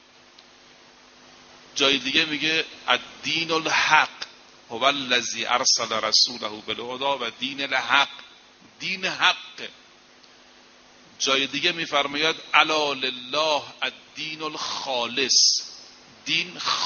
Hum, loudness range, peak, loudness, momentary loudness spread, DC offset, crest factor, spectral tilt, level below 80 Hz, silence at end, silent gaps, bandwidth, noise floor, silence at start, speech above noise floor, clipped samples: none; 4 LU; -2 dBFS; -22 LUFS; 14 LU; under 0.1%; 24 dB; 1 dB/octave; -68 dBFS; 0 s; none; 7 kHz; -52 dBFS; 1.55 s; 28 dB; under 0.1%